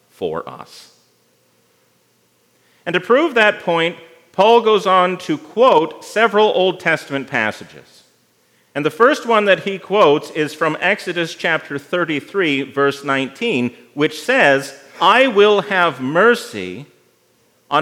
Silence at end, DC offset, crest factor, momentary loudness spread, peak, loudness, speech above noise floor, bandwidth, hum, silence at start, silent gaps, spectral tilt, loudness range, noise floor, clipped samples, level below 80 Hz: 0 s; under 0.1%; 16 dB; 12 LU; 0 dBFS; -16 LUFS; 43 dB; 15.5 kHz; none; 0.2 s; none; -4.5 dB/octave; 5 LU; -59 dBFS; under 0.1%; -74 dBFS